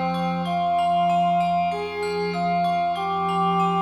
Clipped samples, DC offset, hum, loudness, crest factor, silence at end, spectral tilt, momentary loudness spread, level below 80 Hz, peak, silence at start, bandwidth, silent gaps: under 0.1%; under 0.1%; none; -23 LUFS; 10 dB; 0 s; -6.5 dB/octave; 5 LU; -62 dBFS; -12 dBFS; 0 s; 12 kHz; none